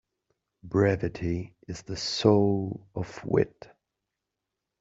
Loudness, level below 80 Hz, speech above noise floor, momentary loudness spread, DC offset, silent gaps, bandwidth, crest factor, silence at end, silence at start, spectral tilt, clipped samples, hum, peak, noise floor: -27 LUFS; -56 dBFS; 59 dB; 15 LU; under 0.1%; none; 7.8 kHz; 24 dB; 1.35 s; 0.65 s; -6 dB/octave; under 0.1%; none; -6 dBFS; -86 dBFS